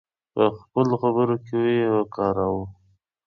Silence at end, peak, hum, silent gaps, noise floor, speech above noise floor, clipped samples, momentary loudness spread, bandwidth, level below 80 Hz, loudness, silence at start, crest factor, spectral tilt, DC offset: 0.55 s; -6 dBFS; none; none; -64 dBFS; 42 dB; under 0.1%; 7 LU; 6.4 kHz; -54 dBFS; -23 LUFS; 0.35 s; 16 dB; -8.5 dB/octave; under 0.1%